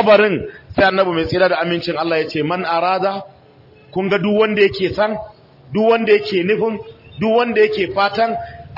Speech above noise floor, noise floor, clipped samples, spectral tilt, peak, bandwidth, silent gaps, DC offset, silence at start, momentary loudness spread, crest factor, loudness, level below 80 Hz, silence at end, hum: 30 dB; -46 dBFS; under 0.1%; -7 dB/octave; -2 dBFS; 5.8 kHz; none; under 0.1%; 0 s; 10 LU; 14 dB; -17 LUFS; -50 dBFS; 0 s; none